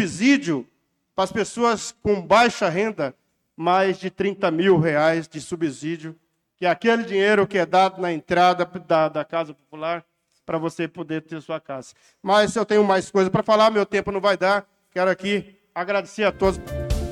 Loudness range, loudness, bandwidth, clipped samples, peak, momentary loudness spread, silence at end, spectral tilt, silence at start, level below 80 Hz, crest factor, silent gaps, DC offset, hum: 4 LU; -21 LUFS; 13.5 kHz; under 0.1%; -6 dBFS; 13 LU; 0 s; -5 dB/octave; 0 s; -42 dBFS; 16 dB; none; under 0.1%; none